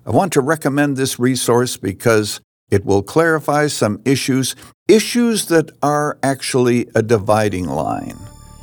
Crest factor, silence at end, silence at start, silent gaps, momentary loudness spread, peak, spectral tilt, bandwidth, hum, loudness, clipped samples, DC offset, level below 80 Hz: 16 dB; 0.3 s; 0.05 s; 2.44-2.67 s, 4.74-4.86 s; 7 LU; -2 dBFS; -5 dB/octave; over 20 kHz; none; -17 LUFS; under 0.1%; under 0.1%; -52 dBFS